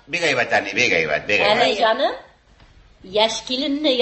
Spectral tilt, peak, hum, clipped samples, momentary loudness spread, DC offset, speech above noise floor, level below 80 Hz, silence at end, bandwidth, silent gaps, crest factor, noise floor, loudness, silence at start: -3 dB/octave; -2 dBFS; none; under 0.1%; 6 LU; under 0.1%; 31 dB; -54 dBFS; 0 s; 8.6 kHz; none; 18 dB; -50 dBFS; -18 LUFS; 0.1 s